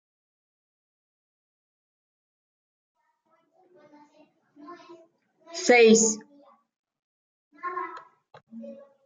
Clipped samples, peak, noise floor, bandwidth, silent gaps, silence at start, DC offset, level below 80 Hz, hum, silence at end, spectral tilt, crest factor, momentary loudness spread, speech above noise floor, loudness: under 0.1%; -6 dBFS; -70 dBFS; 9.4 kHz; 6.79-6.84 s, 6.99-7.51 s, 8.43-8.47 s; 4.7 s; under 0.1%; -80 dBFS; none; 0.3 s; -3 dB/octave; 24 dB; 29 LU; 49 dB; -21 LUFS